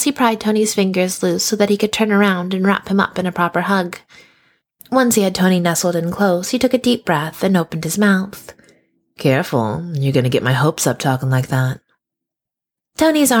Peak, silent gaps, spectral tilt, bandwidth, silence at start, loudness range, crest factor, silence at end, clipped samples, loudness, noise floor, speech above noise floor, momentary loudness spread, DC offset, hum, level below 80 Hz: -2 dBFS; none; -5 dB/octave; 19 kHz; 0 s; 2 LU; 16 dB; 0 s; under 0.1%; -17 LUFS; -85 dBFS; 69 dB; 5 LU; under 0.1%; none; -54 dBFS